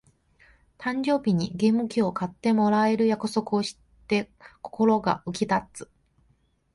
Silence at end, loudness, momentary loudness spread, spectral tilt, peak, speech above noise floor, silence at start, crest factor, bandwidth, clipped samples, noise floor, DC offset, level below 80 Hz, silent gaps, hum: 0.9 s; -25 LUFS; 12 LU; -6 dB/octave; -8 dBFS; 42 dB; 0.8 s; 18 dB; 11.5 kHz; under 0.1%; -66 dBFS; under 0.1%; -60 dBFS; none; none